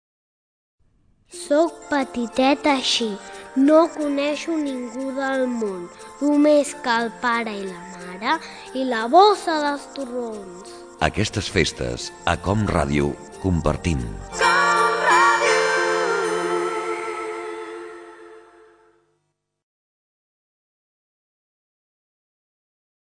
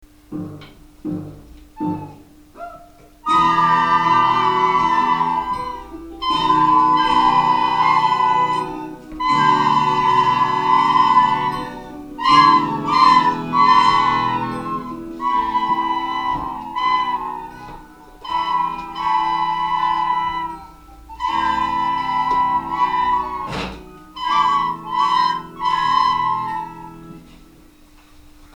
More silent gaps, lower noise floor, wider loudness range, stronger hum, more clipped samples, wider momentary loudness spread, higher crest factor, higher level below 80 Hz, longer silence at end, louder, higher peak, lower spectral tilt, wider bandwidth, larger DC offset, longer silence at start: neither; first, -74 dBFS vs -47 dBFS; about the same, 7 LU vs 7 LU; neither; neither; about the same, 16 LU vs 18 LU; about the same, 20 dB vs 18 dB; about the same, -42 dBFS vs -46 dBFS; first, 4.7 s vs 0.1 s; second, -21 LUFS vs -17 LUFS; about the same, -2 dBFS vs 0 dBFS; about the same, -4.5 dB/octave vs -4.5 dB/octave; about the same, 10 kHz vs 10.5 kHz; neither; first, 1.35 s vs 0.3 s